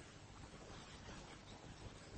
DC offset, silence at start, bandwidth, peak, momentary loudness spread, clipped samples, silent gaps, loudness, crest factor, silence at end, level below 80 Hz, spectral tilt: under 0.1%; 0 s; 8.4 kHz; -42 dBFS; 3 LU; under 0.1%; none; -56 LUFS; 14 dB; 0 s; -64 dBFS; -4 dB/octave